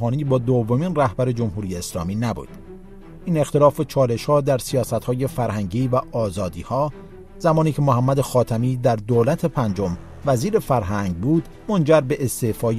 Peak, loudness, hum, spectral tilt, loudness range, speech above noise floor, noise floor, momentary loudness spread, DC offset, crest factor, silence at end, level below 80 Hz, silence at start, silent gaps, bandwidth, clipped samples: -2 dBFS; -21 LUFS; none; -7 dB/octave; 3 LU; 20 dB; -40 dBFS; 9 LU; under 0.1%; 18 dB; 0 s; -42 dBFS; 0 s; none; 15.5 kHz; under 0.1%